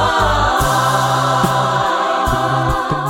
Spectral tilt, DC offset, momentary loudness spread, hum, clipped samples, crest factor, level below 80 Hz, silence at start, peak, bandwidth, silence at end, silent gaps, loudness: -4.5 dB/octave; under 0.1%; 2 LU; none; under 0.1%; 14 dB; -28 dBFS; 0 s; 0 dBFS; 17 kHz; 0 s; none; -15 LUFS